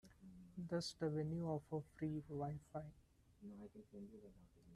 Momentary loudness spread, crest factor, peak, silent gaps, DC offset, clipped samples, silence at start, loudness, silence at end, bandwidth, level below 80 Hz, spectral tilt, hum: 18 LU; 18 dB; -30 dBFS; none; under 0.1%; under 0.1%; 0.05 s; -47 LUFS; 0 s; 12.5 kHz; -72 dBFS; -6.5 dB/octave; none